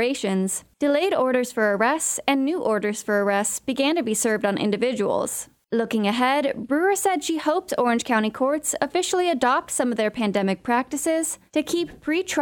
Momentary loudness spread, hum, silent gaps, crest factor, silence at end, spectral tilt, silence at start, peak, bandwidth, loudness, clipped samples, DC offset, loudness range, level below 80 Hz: 4 LU; none; none; 16 dB; 0 s; -3.5 dB/octave; 0 s; -6 dBFS; 20 kHz; -23 LUFS; under 0.1%; under 0.1%; 1 LU; -62 dBFS